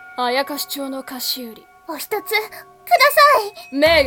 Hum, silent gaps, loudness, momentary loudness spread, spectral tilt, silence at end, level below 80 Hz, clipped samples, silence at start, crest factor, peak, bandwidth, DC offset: none; none; -17 LUFS; 19 LU; -2 dB/octave; 0 s; -48 dBFS; under 0.1%; 0 s; 18 dB; 0 dBFS; 18 kHz; under 0.1%